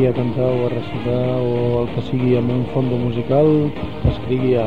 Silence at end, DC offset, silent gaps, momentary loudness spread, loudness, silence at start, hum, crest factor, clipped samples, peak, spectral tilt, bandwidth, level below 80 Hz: 0 s; 2%; none; 6 LU; -19 LUFS; 0 s; none; 14 dB; under 0.1%; -4 dBFS; -9.5 dB/octave; 5.2 kHz; -36 dBFS